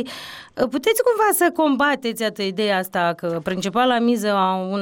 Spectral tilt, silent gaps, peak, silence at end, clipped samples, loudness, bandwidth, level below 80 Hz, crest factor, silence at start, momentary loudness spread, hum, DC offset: -4 dB/octave; none; -8 dBFS; 0 s; under 0.1%; -20 LUFS; 17 kHz; -60 dBFS; 12 dB; 0 s; 8 LU; none; under 0.1%